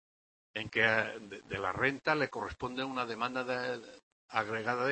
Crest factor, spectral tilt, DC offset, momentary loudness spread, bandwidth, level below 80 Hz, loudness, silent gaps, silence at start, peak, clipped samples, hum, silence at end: 24 dB; -5 dB/octave; under 0.1%; 13 LU; 8.4 kHz; -64 dBFS; -34 LUFS; 4.03-4.28 s; 0.55 s; -12 dBFS; under 0.1%; none; 0 s